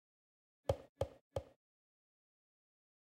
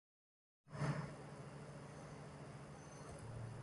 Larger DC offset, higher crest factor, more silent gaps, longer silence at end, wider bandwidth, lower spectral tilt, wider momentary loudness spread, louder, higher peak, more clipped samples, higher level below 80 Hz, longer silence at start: neither; first, 28 dB vs 20 dB; first, 0.89-0.95 s, 1.21-1.30 s vs none; first, 1.65 s vs 0 s; first, 16 kHz vs 11 kHz; about the same, -6.5 dB/octave vs -6.5 dB/octave; second, 6 LU vs 11 LU; first, -45 LUFS vs -50 LUFS; first, -22 dBFS vs -30 dBFS; neither; first, -62 dBFS vs -68 dBFS; about the same, 0.7 s vs 0.65 s